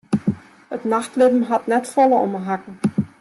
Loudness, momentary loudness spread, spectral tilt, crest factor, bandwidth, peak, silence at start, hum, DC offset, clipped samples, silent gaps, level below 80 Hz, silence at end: -20 LUFS; 11 LU; -7 dB/octave; 14 dB; 12.5 kHz; -4 dBFS; 0.1 s; none; under 0.1%; under 0.1%; none; -62 dBFS; 0.15 s